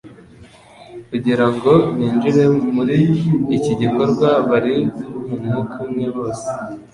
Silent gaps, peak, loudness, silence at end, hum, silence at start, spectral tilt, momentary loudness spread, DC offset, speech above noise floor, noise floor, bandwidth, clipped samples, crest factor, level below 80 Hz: none; -2 dBFS; -17 LUFS; 0.1 s; none; 0.05 s; -8 dB/octave; 11 LU; under 0.1%; 27 dB; -43 dBFS; 11.5 kHz; under 0.1%; 16 dB; -50 dBFS